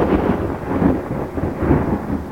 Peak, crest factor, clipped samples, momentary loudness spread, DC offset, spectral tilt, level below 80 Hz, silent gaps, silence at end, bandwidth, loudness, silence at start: -2 dBFS; 16 dB; under 0.1%; 6 LU; 0.3%; -9 dB/octave; -30 dBFS; none; 0 s; 17 kHz; -20 LUFS; 0 s